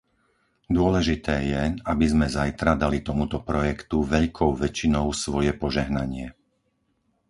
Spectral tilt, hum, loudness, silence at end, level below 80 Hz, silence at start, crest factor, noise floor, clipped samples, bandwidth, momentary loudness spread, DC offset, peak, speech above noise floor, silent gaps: -6 dB/octave; none; -24 LUFS; 1 s; -36 dBFS; 0.7 s; 20 dB; -71 dBFS; under 0.1%; 11.5 kHz; 5 LU; under 0.1%; -6 dBFS; 47 dB; none